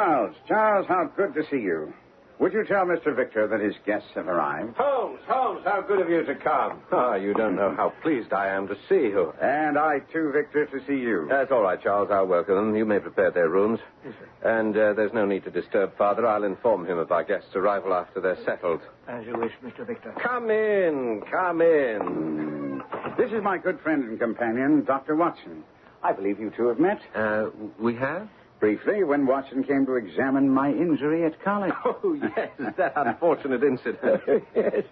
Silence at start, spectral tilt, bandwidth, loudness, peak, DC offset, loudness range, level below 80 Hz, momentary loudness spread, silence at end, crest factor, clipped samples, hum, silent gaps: 0 s; -9.5 dB/octave; 5 kHz; -25 LUFS; -10 dBFS; under 0.1%; 3 LU; -66 dBFS; 7 LU; 0.05 s; 14 dB; under 0.1%; none; none